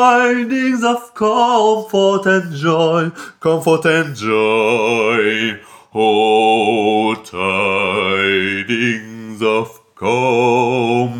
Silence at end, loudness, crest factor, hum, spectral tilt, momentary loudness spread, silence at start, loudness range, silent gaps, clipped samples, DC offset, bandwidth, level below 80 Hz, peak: 0 s; -15 LUFS; 14 dB; none; -5 dB/octave; 7 LU; 0 s; 2 LU; none; under 0.1%; under 0.1%; 17 kHz; -64 dBFS; -2 dBFS